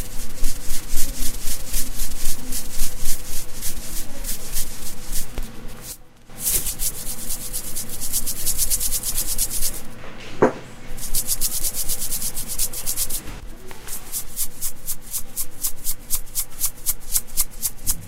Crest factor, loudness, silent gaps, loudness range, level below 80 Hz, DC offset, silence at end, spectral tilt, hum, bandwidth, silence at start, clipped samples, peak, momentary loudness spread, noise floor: 18 dB; -25 LUFS; none; 6 LU; -28 dBFS; under 0.1%; 0 s; -2 dB/octave; none; 16 kHz; 0 s; under 0.1%; 0 dBFS; 13 LU; -38 dBFS